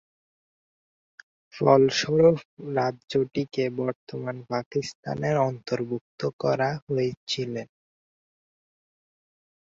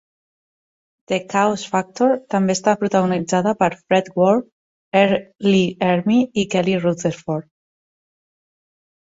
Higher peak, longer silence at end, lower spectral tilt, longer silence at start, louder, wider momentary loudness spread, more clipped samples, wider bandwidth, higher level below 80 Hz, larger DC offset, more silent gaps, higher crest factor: about the same, -4 dBFS vs -2 dBFS; first, 2.1 s vs 1.65 s; about the same, -6 dB/octave vs -5.5 dB/octave; first, 1.55 s vs 1.1 s; second, -26 LUFS vs -19 LUFS; first, 13 LU vs 7 LU; neither; about the same, 7.8 kHz vs 8 kHz; about the same, -64 dBFS vs -60 dBFS; neither; first, 2.45-2.57 s, 3.95-4.07 s, 4.66-4.71 s, 4.95-5.03 s, 6.01-6.18 s, 6.33-6.39 s, 6.82-6.87 s, 7.17-7.27 s vs 4.52-4.92 s; about the same, 22 dB vs 18 dB